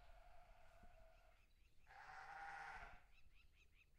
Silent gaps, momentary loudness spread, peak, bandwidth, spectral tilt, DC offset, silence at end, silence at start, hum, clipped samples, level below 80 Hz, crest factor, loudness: none; 14 LU; -42 dBFS; 10 kHz; -3 dB/octave; under 0.1%; 0 s; 0 s; none; under 0.1%; -70 dBFS; 20 dB; -58 LUFS